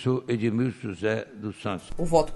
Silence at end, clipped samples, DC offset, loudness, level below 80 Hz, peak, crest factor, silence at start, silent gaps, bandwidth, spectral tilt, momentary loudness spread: 0 s; under 0.1%; under 0.1%; -28 LUFS; -42 dBFS; -8 dBFS; 18 dB; 0 s; none; 11.5 kHz; -7 dB/octave; 9 LU